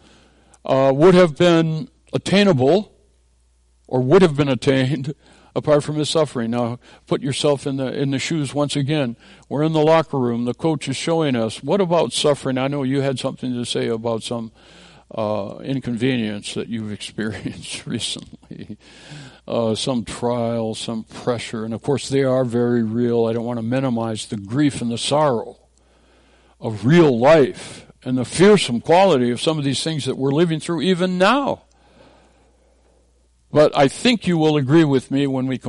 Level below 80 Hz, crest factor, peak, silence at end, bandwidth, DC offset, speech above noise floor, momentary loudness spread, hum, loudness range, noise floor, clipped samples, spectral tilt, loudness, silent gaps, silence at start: -52 dBFS; 16 dB; -4 dBFS; 0 s; 11.5 kHz; under 0.1%; 39 dB; 15 LU; none; 8 LU; -58 dBFS; under 0.1%; -6 dB/octave; -19 LUFS; none; 0.65 s